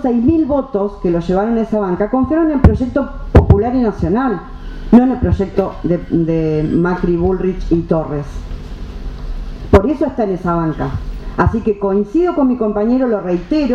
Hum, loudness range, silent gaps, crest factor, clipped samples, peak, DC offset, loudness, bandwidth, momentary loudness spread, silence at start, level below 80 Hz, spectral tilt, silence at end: none; 4 LU; none; 14 dB; 0.2%; 0 dBFS; under 0.1%; -15 LUFS; 7.6 kHz; 16 LU; 0 s; -24 dBFS; -9.5 dB/octave; 0 s